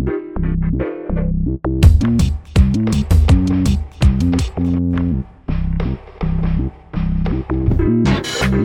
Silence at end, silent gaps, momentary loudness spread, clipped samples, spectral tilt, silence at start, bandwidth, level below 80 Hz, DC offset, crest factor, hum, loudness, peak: 0 s; none; 9 LU; under 0.1%; -7 dB/octave; 0 s; 13.5 kHz; -20 dBFS; under 0.1%; 16 dB; none; -17 LUFS; 0 dBFS